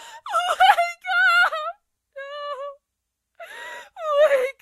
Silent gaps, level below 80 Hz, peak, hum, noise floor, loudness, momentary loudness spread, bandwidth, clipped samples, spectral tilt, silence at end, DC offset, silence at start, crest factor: none; -68 dBFS; -2 dBFS; none; -80 dBFS; -19 LUFS; 20 LU; 15 kHz; under 0.1%; 1.5 dB/octave; 0.1 s; under 0.1%; 0 s; 22 dB